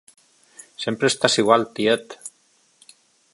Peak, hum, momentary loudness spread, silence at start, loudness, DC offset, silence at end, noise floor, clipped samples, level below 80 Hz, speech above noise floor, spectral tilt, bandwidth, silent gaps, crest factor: 0 dBFS; none; 21 LU; 0.8 s; -20 LUFS; under 0.1%; 1.05 s; -61 dBFS; under 0.1%; -70 dBFS; 42 dB; -3.5 dB/octave; 11.5 kHz; none; 24 dB